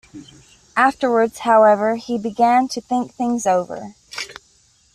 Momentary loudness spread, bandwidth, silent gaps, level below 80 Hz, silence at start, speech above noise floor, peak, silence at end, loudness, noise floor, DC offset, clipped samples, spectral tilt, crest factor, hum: 17 LU; 14 kHz; none; -60 dBFS; 0.15 s; 39 dB; -2 dBFS; 0.6 s; -18 LUFS; -56 dBFS; under 0.1%; under 0.1%; -4.5 dB/octave; 16 dB; none